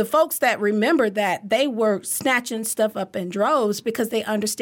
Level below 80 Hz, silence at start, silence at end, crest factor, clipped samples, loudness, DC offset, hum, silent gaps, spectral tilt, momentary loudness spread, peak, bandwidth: -68 dBFS; 0 s; 0 s; 14 dB; under 0.1%; -21 LUFS; under 0.1%; none; none; -3.5 dB/octave; 5 LU; -6 dBFS; 17.5 kHz